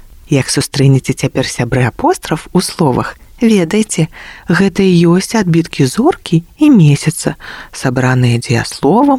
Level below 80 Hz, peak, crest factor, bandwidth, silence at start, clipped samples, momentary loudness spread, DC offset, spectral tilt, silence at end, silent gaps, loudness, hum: -40 dBFS; 0 dBFS; 12 dB; 15.5 kHz; 0.3 s; under 0.1%; 8 LU; under 0.1%; -6 dB/octave; 0 s; none; -12 LUFS; none